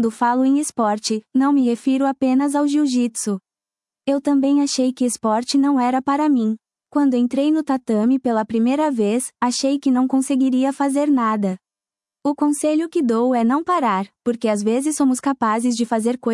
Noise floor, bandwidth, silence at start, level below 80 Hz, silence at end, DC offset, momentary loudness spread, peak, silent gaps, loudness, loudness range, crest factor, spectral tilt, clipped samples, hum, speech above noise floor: under -90 dBFS; 12 kHz; 0 s; -70 dBFS; 0 s; under 0.1%; 5 LU; -6 dBFS; none; -19 LUFS; 1 LU; 12 dB; -4.5 dB/octave; under 0.1%; none; over 72 dB